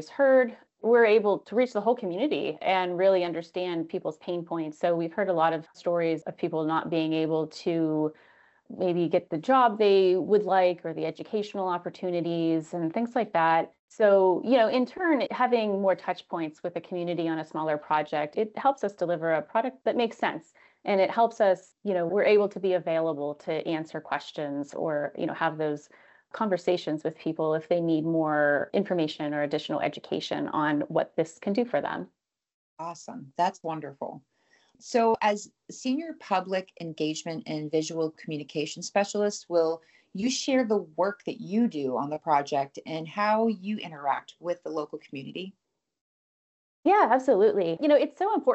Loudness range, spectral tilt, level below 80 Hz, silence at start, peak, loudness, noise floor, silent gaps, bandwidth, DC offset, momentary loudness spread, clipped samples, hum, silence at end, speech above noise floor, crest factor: 6 LU; -5.5 dB/octave; -78 dBFS; 0 s; -10 dBFS; -27 LUFS; -64 dBFS; 13.79-13.88 s, 32.54-32.77 s, 46.01-46.83 s; 8.2 kHz; under 0.1%; 12 LU; under 0.1%; none; 0 s; 38 dB; 16 dB